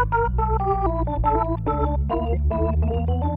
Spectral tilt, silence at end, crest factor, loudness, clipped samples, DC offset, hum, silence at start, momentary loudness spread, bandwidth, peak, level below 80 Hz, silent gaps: -11.5 dB/octave; 0 s; 14 dB; -23 LUFS; under 0.1%; under 0.1%; none; 0 s; 2 LU; 3.8 kHz; -8 dBFS; -26 dBFS; none